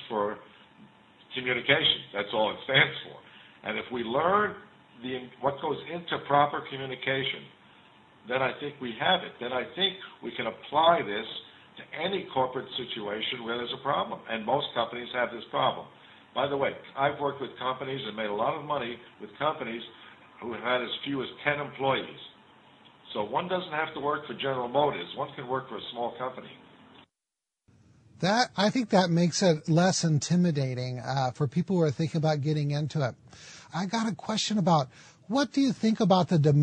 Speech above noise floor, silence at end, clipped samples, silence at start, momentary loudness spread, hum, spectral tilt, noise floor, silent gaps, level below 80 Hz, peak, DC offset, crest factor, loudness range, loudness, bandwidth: 60 dB; 0 s; under 0.1%; 0 s; 14 LU; none; -5 dB/octave; -89 dBFS; none; -70 dBFS; -8 dBFS; under 0.1%; 22 dB; 6 LU; -29 LUFS; 9.4 kHz